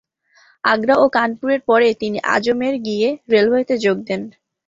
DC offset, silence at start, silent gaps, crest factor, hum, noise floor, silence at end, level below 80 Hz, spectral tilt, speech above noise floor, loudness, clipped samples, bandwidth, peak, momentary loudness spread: under 0.1%; 0.65 s; none; 16 dB; none; -55 dBFS; 0.35 s; -60 dBFS; -5 dB/octave; 38 dB; -17 LUFS; under 0.1%; 7.8 kHz; 0 dBFS; 8 LU